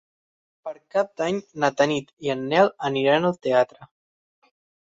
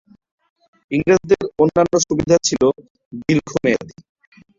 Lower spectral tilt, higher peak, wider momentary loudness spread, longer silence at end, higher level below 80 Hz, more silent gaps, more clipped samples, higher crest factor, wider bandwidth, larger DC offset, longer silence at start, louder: about the same, -5.5 dB/octave vs -5 dB/octave; about the same, -4 dBFS vs -2 dBFS; about the same, 9 LU vs 9 LU; first, 1.1 s vs 0.7 s; second, -66 dBFS vs -48 dBFS; second, 2.13-2.17 s vs 2.90-2.95 s, 3.05-3.11 s; neither; about the same, 20 dB vs 18 dB; about the same, 7.8 kHz vs 7.6 kHz; neither; second, 0.65 s vs 0.9 s; second, -23 LUFS vs -17 LUFS